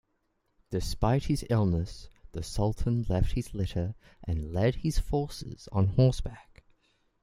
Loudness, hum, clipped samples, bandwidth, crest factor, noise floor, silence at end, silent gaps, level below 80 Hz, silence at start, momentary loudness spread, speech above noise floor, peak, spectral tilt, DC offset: -30 LUFS; none; under 0.1%; 15.5 kHz; 18 dB; -75 dBFS; 0.8 s; none; -38 dBFS; 0.7 s; 14 LU; 47 dB; -10 dBFS; -7 dB/octave; under 0.1%